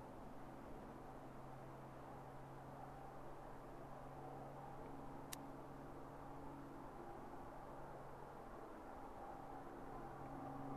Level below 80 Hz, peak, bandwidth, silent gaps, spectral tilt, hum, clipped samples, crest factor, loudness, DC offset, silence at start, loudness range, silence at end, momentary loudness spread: -64 dBFS; -24 dBFS; 13.5 kHz; none; -6 dB/octave; none; under 0.1%; 30 dB; -55 LUFS; under 0.1%; 0 s; 2 LU; 0 s; 3 LU